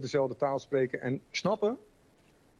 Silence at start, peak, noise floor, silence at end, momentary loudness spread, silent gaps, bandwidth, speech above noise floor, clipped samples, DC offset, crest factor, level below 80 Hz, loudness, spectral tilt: 0 s; -16 dBFS; -64 dBFS; 0.8 s; 5 LU; none; 10 kHz; 33 dB; under 0.1%; under 0.1%; 16 dB; -70 dBFS; -31 LUFS; -5.5 dB/octave